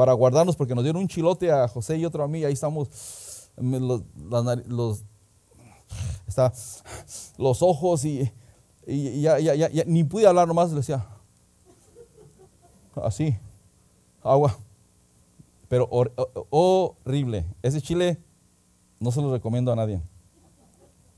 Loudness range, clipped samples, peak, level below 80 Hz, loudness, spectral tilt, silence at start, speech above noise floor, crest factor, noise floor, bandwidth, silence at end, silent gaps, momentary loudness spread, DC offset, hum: 7 LU; under 0.1%; -4 dBFS; -52 dBFS; -24 LUFS; -7 dB/octave; 0 s; 38 dB; 20 dB; -61 dBFS; 11 kHz; 1.1 s; none; 16 LU; under 0.1%; none